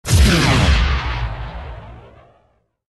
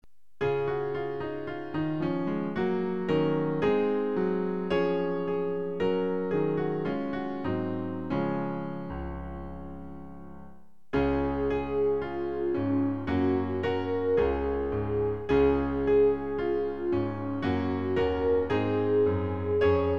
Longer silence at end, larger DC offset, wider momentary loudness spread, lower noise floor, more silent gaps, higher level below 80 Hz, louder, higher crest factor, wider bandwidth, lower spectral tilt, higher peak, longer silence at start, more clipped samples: first, 0.95 s vs 0 s; second, under 0.1% vs 0.5%; first, 21 LU vs 9 LU; first, -60 dBFS vs -54 dBFS; neither; first, -22 dBFS vs -46 dBFS; first, -16 LUFS vs -29 LUFS; about the same, 16 dB vs 16 dB; first, 12.5 kHz vs 6.2 kHz; second, -4.5 dB/octave vs -9 dB/octave; first, -2 dBFS vs -12 dBFS; second, 0.05 s vs 0.4 s; neither